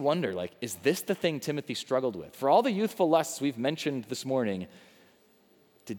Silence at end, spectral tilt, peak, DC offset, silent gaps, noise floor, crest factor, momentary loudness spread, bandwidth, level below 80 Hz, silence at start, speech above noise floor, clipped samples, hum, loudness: 0 s; -5 dB/octave; -10 dBFS; under 0.1%; none; -63 dBFS; 20 dB; 10 LU; over 20 kHz; -76 dBFS; 0 s; 34 dB; under 0.1%; none; -29 LUFS